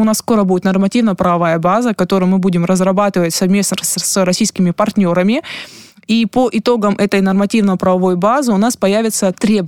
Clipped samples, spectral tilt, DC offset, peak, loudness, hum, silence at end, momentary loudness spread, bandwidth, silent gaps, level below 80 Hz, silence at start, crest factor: under 0.1%; -5 dB/octave; under 0.1%; -2 dBFS; -14 LUFS; none; 0 s; 2 LU; 17 kHz; none; -48 dBFS; 0 s; 12 dB